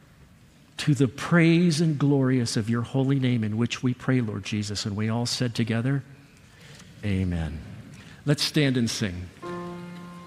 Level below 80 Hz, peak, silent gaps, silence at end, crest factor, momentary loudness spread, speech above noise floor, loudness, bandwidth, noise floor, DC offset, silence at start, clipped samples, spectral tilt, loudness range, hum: -54 dBFS; -8 dBFS; none; 0 s; 18 dB; 16 LU; 30 dB; -25 LUFS; 14.5 kHz; -54 dBFS; under 0.1%; 0.8 s; under 0.1%; -5.5 dB/octave; 6 LU; none